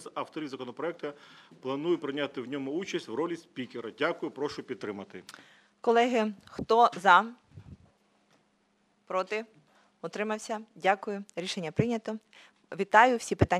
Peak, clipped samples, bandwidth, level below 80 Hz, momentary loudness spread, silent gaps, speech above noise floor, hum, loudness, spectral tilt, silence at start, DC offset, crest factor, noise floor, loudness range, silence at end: -4 dBFS; under 0.1%; 13 kHz; -60 dBFS; 18 LU; none; 41 dB; none; -29 LUFS; -5 dB/octave; 0 s; under 0.1%; 26 dB; -71 dBFS; 8 LU; 0 s